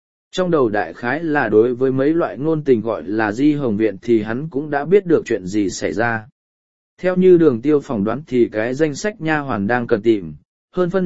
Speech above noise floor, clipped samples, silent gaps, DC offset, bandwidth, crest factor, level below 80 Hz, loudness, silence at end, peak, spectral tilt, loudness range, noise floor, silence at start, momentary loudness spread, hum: over 73 dB; under 0.1%; 6.32-6.97 s, 10.45-10.68 s; 1%; 8 kHz; 16 dB; -52 dBFS; -18 LUFS; 0 s; -2 dBFS; -6.5 dB/octave; 2 LU; under -90 dBFS; 0.3 s; 7 LU; none